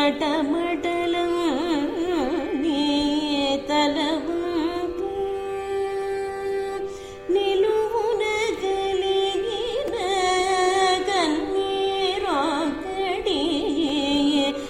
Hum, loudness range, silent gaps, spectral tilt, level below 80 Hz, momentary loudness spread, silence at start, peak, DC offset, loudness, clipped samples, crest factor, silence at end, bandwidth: none; 3 LU; none; -3.5 dB/octave; -48 dBFS; 7 LU; 0 s; -8 dBFS; under 0.1%; -23 LUFS; under 0.1%; 14 dB; 0 s; 14.5 kHz